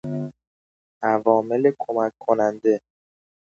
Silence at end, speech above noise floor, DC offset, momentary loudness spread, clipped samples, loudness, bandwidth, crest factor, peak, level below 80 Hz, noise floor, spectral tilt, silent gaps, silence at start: 0.75 s; over 70 dB; under 0.1%; 10 LU; under 0.1%; -22 LUFS; 7.2 kHz; 20 dB; -2 dBFS; -68 dBFS; under -90 dBFS; -8.5 dB/octave; 0.47-1.01 s; 0.05 s